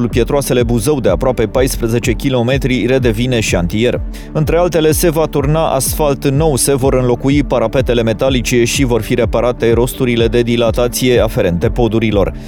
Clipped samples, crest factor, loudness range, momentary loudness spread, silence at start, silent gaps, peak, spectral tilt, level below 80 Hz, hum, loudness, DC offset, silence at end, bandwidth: under 0.1%; 12 dB; 1 LU; 3 LU; 0 s; none; 0 dBFS; -5.5 dB/octave; -24 dBFS; none; -13 LUFS; under 0.1%; 0 s; over 20 kHz